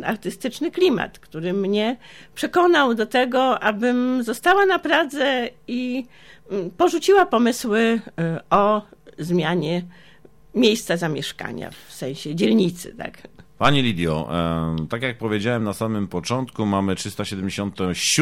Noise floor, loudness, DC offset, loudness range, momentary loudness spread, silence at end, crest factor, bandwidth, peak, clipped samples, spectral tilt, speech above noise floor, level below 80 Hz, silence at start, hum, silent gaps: -49 dBFS; -21 LUFS; under 0.1%; 5 LU; 13 LU; 0 s; 18 dB; 16.5 kHz; -4 dBFS; under 0.1%; -4.5 dB/octave; 28 dB; -50 dBFS; 0 s; none; none